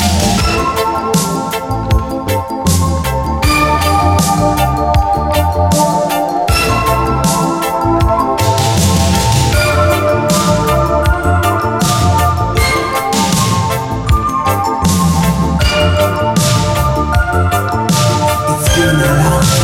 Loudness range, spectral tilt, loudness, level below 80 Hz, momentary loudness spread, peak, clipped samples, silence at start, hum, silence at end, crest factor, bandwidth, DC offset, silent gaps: 1 LU; -5 dB/octave; -12 LUFS; -22 dBFS; 4 LU; 0 dBFS; under 0.1%; 0 s; none; 0 s; 12 dB; 17 kHz; under 0.1%; none